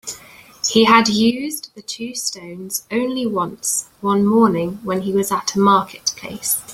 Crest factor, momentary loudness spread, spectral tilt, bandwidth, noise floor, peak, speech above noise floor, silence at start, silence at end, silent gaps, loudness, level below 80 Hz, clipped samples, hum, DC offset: 18 dB; 14 LU; -3.5 dB/octave; 16.5 kHz; -43 dBFS; -2 dBFS; 25 dB; 0.05 s; 0 s; none; -18 LUFS; -56 dBFS; under 0.1%; none; under 0.1%